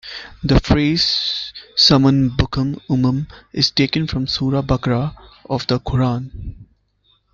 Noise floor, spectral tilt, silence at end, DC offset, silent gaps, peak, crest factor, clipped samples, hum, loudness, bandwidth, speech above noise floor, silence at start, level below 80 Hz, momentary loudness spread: -61 dBFS; -6 dB/octave; 0.7 s; under 0.1%; none; -2 dBFS; 16 dB; under 0.1%; none; -17 LUFS; 7.4 kHz; 43 dB; 0.05 s; -34 dBFS; 13 LU